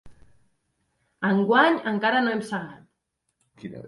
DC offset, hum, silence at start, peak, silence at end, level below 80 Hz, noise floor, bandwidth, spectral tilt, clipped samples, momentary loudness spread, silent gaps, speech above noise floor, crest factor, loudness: under 0.1%; none; 0.05 s; -6 dBFS; 0 s; -66 dBFS; -77 dBFS; 11.5 kHz; -6 dB/octave; under 0.1%; 22 LU; none; 55 dB; 20 dB; -23 LUFS